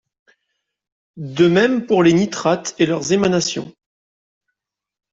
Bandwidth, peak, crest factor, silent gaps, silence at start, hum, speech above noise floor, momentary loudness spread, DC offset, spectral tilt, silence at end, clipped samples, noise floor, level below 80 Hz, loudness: 7.8 kHz; -2 dBFS; 16 dB; none; 1.15 s; none; 68 dB; 15 LU; under 0.1%; -5 dB/octave; 1.4 s; under 0.1%; -85 dBFS; -58 dBFS; -16 LUFS